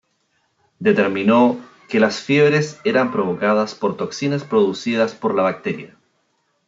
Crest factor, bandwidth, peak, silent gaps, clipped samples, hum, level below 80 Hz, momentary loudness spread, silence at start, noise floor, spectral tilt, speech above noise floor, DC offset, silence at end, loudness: 16 dB; 7.8 kHz; -2 dBFS; none; under 0.1%; none; -70 dBFS; 8 LU; 0.8 s; -67 dBFS; -5 dB/octave; 49 dB; under 0.1%; 0.8 s; -18 LUFS